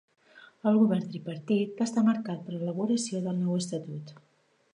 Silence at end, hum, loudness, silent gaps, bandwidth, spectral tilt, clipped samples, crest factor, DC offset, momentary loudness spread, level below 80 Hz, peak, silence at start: 0.6 s; none; -29 LUFS; none; 10.5 kHz; -6.5 dB/octave; under 0.1%; 18 dB; under 0.1%; 13 LU; -80 dBFS; -12 dBFS; 0.35 s